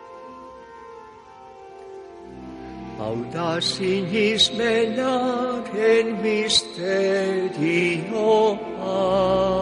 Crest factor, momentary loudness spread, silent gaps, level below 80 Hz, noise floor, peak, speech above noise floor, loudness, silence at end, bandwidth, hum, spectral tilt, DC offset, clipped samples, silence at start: 18 dB; 22 LU; none; -52 dBFS; -44 dBFS; -6 dBFS; 23 dB; -21 LUFS; 0 s; 11 kHz; none; -4 dB/octave; under 0.1%; under 0.1%; 0 s